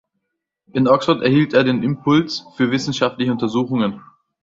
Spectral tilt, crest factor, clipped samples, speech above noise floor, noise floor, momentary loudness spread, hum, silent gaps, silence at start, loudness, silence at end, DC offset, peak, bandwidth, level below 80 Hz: -6.5 dB/octave; 16 dB; under 0.1%; 60 dB; -77 dBFS; 6 LU; none; none; 0.75 s; -18 LUFS; 0.45 s; under 0.1%; -2 dBFS; 7.8 kHz; -56 dBFS